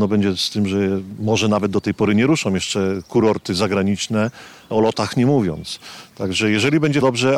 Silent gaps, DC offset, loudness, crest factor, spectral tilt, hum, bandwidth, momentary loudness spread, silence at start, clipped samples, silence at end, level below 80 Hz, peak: none; under 0.1%; -19 LUFS; 14 dB; -5.5 dB/octave; none; 13.5 kHz; 7 LU; 0 s; under 0.1%; 0 s; -54 dBFS; -6 dBFS